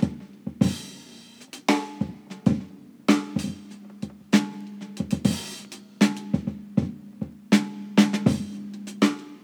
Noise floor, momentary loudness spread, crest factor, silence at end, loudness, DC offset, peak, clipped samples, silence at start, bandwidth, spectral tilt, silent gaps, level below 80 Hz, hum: -47 dBFS; 16 LU; 22 dB; 0.05 s; -25 LUFS; under 0.1%; -4 dBFS; under 0.1%; 0 s; 19 kHz; -5.5 dB/octave; none; -54 dBFS; none